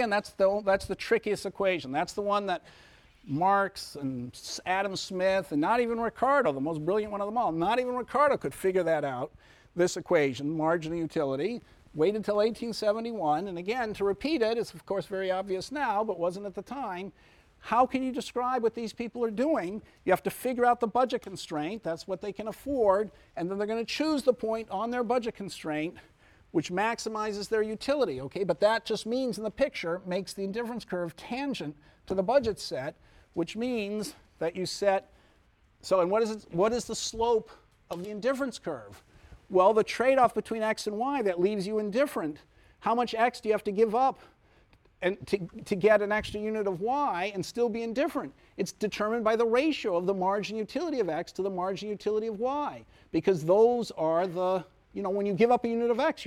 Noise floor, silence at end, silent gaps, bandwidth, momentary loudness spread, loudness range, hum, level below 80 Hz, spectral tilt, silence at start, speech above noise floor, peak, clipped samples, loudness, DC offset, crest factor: -64 dBFS; 0 s; none; 16 kHz; 11 LU; 4 LU; none; -60 dBFS; -5 dB/octave; 0 s; 35 dB; -10 dBFS; under 0.1%; -29 LUFS; under 0.1%; 18 dB